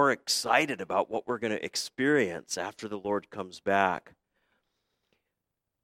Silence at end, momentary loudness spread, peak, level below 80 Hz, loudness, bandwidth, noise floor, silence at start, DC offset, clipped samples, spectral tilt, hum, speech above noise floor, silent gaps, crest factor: 1.85 s; 11 LU; -6 dBFS; -74 dBFS; -29 LUFS; 16.5 kHz; -85 dBFS; 0 s; under 0.1%; under 0.1%; -3 dB/octave; none; 56 dB; none; 24 dB